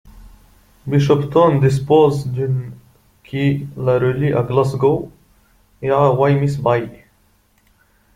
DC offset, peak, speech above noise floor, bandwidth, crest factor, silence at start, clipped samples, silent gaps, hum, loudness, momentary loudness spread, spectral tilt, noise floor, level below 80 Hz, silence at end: under 0.1%; -2 dBFS; 42 dB; 10.5 kHz; 16 dB; 0.05 s; under 0.1%; none; none; -17 LUFS; 12 LU; -8 dB/octave; -57 dBFS; -48 dBFS; 1.2 s